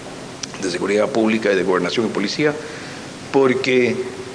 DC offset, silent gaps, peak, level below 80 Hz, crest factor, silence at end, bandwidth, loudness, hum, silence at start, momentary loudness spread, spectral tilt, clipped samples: under 0.1%; none; -2 dBFS; -58 dBFS; 16 dB; 0 s; 10.5 kHz; -19 LUFS; none; 0 s; 14 LU; -4.5 dB/octave; under 0.1%